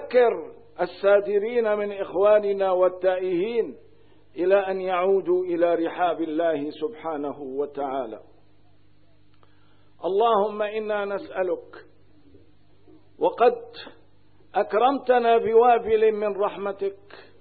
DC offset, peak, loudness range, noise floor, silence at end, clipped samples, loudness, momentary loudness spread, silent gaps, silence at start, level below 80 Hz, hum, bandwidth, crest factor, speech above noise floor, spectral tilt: 0.3%; -8 dBFS; 7 LU; -60 dBFS; 0.2 s; under 0.1%; -23 LUFS; 12 LU; none; 0 s; -64 dBFS; 50 Hz at -65 dBFS; 4.7 kHz; 18 dB; 37 dB; -9.5 dB/octave